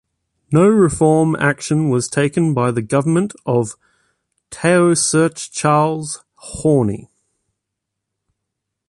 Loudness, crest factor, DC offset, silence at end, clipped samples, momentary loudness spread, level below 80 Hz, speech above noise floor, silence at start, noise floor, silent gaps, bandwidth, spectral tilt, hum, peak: -16 LUFS; 14 dB; under 0.1%; 1.9 s; under 0.1%; 11 LU; -48 dBFS; 64 dB; 0.5 s; -79 dBFS; none; 11.5 kHz; -5.5 dB/octave; none; -2 dBFS